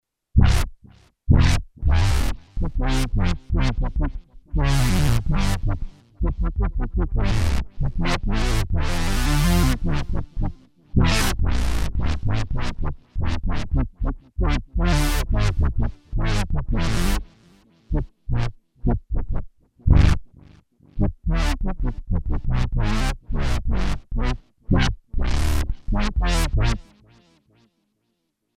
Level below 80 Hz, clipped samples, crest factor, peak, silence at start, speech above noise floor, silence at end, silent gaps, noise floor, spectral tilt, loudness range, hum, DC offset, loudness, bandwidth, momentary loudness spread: -24 dBFS; under 0.1%; 18 dB; -2 dBFS; 0.35 s; 54 dB; 1.75 s; none; -74 dBFS; -5.5 dB/octave; 4 LU; none; under 0.1%; -24 LUFS; 16 kHz; 10 LU